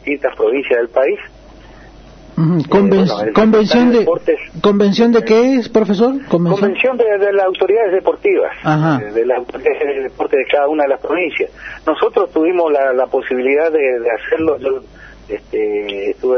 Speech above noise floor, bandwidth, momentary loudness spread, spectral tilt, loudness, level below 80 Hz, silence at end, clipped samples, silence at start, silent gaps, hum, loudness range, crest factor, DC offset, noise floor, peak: 25 dB; 6.6 kHz; 8 LU; -7 dB/octave; -14 LUFS; -46 dBFS; 0 s; under 0.1%; 0.05 s; none; none; 4 LU; 14 dB; under 0.1%; -38 dBFS; 0 dBFS